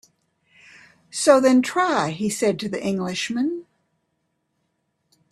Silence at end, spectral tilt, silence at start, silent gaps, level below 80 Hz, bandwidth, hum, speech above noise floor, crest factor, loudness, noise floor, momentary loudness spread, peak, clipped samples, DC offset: 1.7 s; -4.5 dB/octave; 1.15 s; none; -66 dBFS; 13 kHz; none; 53 dB; 22 dB; -21 LUFS; -73 dBFS; 11 LU; 0 dBFS; under 0.1%; under 0.1%